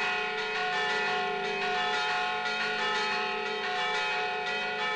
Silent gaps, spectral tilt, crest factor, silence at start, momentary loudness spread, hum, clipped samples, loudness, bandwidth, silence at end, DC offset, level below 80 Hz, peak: none; -2 dB/octave; 10 dB; 0 s; 3 LU; none; under 0.1%; -29 LUFS; 10.5 kHz; 0 s; under 0.1%; -70 dBFS; -20 dBFS